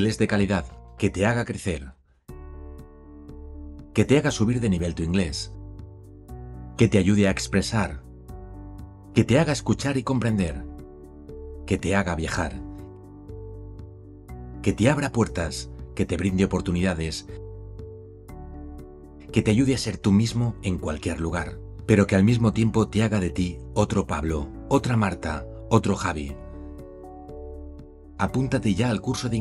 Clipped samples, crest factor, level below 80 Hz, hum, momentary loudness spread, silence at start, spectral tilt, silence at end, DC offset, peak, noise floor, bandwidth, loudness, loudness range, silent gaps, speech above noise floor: under 0.1%; 22 dB; -40 dBFS; none; 22 LU; 0 s; -6 dB/octave; 0 s; under 0.1%; -4 dBFS; -44 dBFS; 12 kHz; -24 LUFS; 6 LU; none; 21 dB